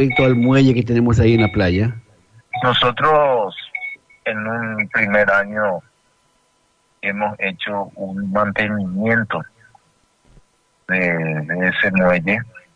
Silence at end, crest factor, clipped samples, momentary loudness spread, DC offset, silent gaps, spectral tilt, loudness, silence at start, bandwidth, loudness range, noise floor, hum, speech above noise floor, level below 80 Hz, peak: 0.15 s; 16 dB; under 0.1%; 12 LU; under 0.1%; none; -7 dB/octave; -18 LUFS; 0 s; 8 kHz; 7 LU; -61 dBFS; none; 44 dB; -44 dBFS; -4 dBFS